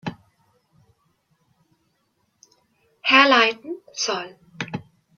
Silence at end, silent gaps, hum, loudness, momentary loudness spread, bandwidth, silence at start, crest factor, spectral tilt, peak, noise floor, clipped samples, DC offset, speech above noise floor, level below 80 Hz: 0.35 s; none; none; -19 LUFS; 22 LU; 7.2 kHz; 0.05 s; 24 dB; -2.5 dB/octave; -2 dBFS; -70 dBFS; under 0.1%; under 0.1%; 50 dB; -70 dBFS